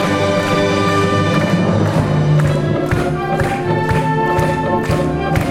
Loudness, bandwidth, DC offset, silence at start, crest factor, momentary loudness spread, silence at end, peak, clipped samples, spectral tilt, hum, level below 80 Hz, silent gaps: -15 LUFS; 14.5 kHz; under 0.1%; 0 s; 14 dB; 3 LU; 0 s; -2 dBFS; under 0.1%; -6.5 dB/octave; none; -34 dBFS; none